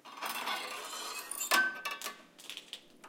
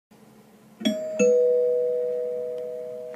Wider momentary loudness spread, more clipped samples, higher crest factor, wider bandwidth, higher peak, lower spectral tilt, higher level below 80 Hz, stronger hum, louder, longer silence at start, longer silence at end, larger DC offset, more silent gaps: first, 17 LU vs 13 LU; neither; first, 24 dB vs 16 dB; first, 17 kHz vs 12.5 kHz; about the same, -12 dBFS vs -10 dBFS; second, 1 dB/octave vs -4.5 dB/octave; second, -84 dBFS vs -76 dBFS; neither; second, -35 LUFS vs -25 LUFS; second, 0.05 s vs 0.8 s; about the same, 0 s vs 0 s; neither; neither